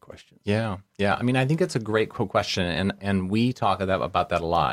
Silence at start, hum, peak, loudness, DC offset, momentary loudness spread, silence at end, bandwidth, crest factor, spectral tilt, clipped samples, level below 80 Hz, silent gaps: 0.1 s; none; -8 dBFS; -25 LUFS; under 0.1%; 4 LU; 0 s; 15 kHz; 18 dB; -6 dB/octave; under 0.1%; -50 dBFS; none